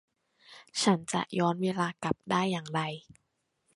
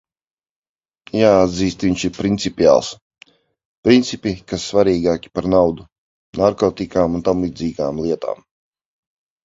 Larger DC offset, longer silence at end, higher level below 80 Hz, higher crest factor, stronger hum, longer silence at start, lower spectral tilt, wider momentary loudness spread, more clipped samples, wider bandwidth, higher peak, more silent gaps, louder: neither; second, 0.75 s vs 1.1 s; second, -68 dBFS vs -44 dBFS; about the same, 22 dB vs 18 dB; neither; second, 0.5 s vs 1.15 s; about the same, -5 dB/octave vs -6 dB/octave; about the same, 9 LU vs 11 LU; neither; first, 11.5 kHz vs 7.8 kHz; second, -10 dBFS vs 0 dBFS; second, none vs 3.02-3.10 s, 3.65-3.83 s, 5.92-6.33 s; second, -30 LUFS vs -18 LUFS